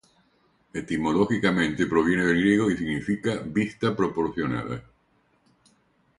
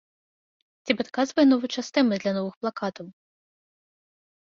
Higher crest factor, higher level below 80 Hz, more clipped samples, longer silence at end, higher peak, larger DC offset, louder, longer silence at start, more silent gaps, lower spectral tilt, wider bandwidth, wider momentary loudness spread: about the same, 20 dB vs 22 dB; first, -52 dBFS vs -70 dBFS; neither; about the same, 1.4 s vs 1.5 s; about the same, -6 dBFS vs -6 dBFS; neither; about the same, -25 LUFS vs -25 LUFS; about the same, 0.75 s vs 0.85 s; second, none vs 2.57-2.61 s; first, -6.5 dB/octave vs -5 dB/octave; first, 11.5 kHz vs 7.4 kHz; second, 10 LU vs 17 LU